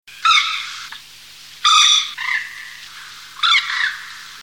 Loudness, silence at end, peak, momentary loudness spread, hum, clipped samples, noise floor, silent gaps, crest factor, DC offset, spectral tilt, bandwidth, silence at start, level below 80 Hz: -15 LUFS; 0 s; -2 dBFS; 23 LU; none; under 0.1%; -41 dBFS; none; 18 dB; 0.2%; 4.5 dB/octave; 18 kHz; 0.1 s; -64 dBFS